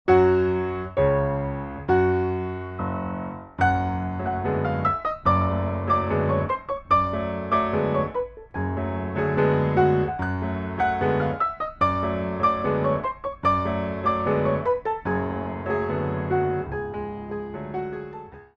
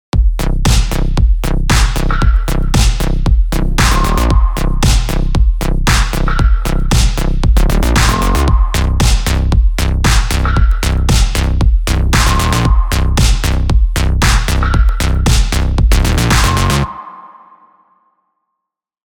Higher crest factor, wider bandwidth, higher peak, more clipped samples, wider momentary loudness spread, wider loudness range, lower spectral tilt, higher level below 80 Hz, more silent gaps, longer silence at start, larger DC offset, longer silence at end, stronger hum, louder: first, 18 dB vs 10 dB; second, 6.6 kHz vs 20 kHz; second, -6 dBFS vs 0 dBFS; neither; first, 10 LU vs 4 LU; about the same, 2 LU vs 1 LU; first, -9 dB/octave vs -4.5 dB/octave; second, -44 dBFS vs -12 dBFS; neither; about the same, 0.05 s vs 0.15 s; neither; second, 0.1 s vs 1.85 s; neither; second, -24 LUFS vs -14 LUFS